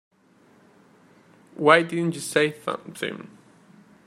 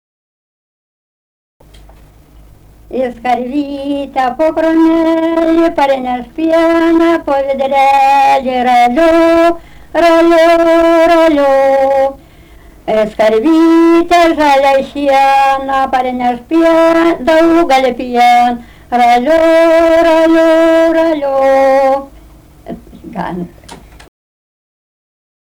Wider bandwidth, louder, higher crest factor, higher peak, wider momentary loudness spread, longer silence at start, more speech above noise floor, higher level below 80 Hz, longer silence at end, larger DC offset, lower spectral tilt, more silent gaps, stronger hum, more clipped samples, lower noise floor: second, 15 kHz vs 17 kHz; second, -23 LUFS vs -10 LUFS; first, 26 dB vs 8 dB; about the same, 0 dBFS vs -2 dBFS; first, 14 LU vs 10 LU; second, 1.6 s vs 2.9 s; first, 35 dB vs 30 dB; second, -74 dBFS vs -40 dBFS; second, 0.8 s vs 1.8 s; neither; about the same, -4.5 dB/octave vs -5 dB/octave; neither; neither; neither; first, -58 dBFS vs -39 dBFS